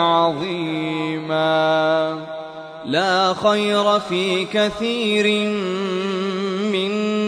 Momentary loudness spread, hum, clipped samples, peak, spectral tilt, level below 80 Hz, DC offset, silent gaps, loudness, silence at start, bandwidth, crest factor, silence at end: 7 LU; none; under 0.1%; -4 dBFS; -5 dB/octave; -60 dBFS; under 0.1%; none; -19 LUFS; 0 s; 13 kHz; 16 dB; 0 s